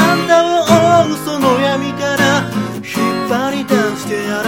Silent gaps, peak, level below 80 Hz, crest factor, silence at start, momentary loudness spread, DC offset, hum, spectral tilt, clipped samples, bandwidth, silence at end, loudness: none; 0 dBFS; -52 dBFS; 14 dB; 0 s; 8 LU; 0.2%; none; -4.5 dB/octave; under 0.1%; 17 kHz; 0 s; -14 LUFS